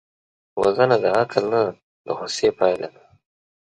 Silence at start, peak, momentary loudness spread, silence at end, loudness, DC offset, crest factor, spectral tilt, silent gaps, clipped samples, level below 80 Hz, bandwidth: 0.55 s; -2 dBFS; 13 LU; 0.75 s; -21 LUFS; under 0.1%; 20 dB; -5 dB/octave; 1.83-2.05 s; under 0.1%; -60 dBFS; 11 kHz